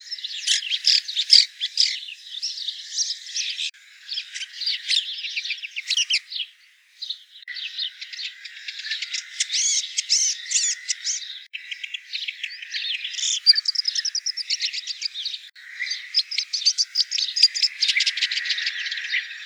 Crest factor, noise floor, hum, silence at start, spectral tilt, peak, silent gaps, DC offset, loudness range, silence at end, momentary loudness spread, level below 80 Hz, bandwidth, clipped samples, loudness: 24 dB; -55 dBFS; none; 0 s; 14 dB/octave; 0 dBFS; none; under 0.1%; 7 LU; 0 s; 15 LU; under -90 dBFS; over 20 kHz; under 0.1%; -22 LUFS